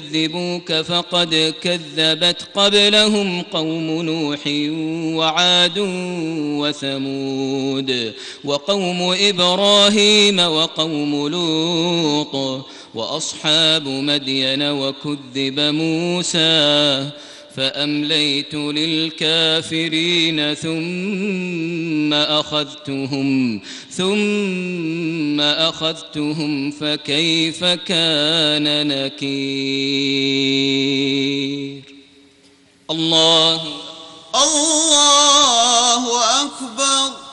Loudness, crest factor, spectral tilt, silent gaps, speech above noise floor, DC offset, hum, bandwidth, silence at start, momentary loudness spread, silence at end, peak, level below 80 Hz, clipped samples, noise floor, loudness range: -16 LUFS; 18 dB; -2.5 dB/octave; none; 33 dB; under 0.1%; none; 11 kHz; 0 s; 11 LU; 0 s; -2 dBFS; -60 dBFS; under 0.1%; -51 dBFS; 6 LU